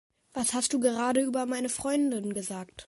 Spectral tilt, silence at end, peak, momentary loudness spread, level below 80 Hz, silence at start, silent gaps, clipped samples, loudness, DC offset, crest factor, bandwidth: -3 dB/octave; 0.05 s; -12 dBFS; 8 LU; -64 dBFS; 0.35 s; none; under 0.1%; -29 LUFS; under 0.1%; 18 dB; 12 kHz